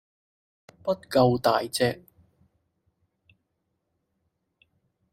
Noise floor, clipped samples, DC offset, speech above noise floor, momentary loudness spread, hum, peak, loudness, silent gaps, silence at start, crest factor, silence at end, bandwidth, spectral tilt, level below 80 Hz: -78 dBFS; under 0.1%; under 0.1%; 54 dB; 12 LU; none; -8 dBFS; -25 LUFS; none; 0.85 s; 22 dB; 3.2 s; 15.5 kHz; -5.5 dB/octave; -62 dBFS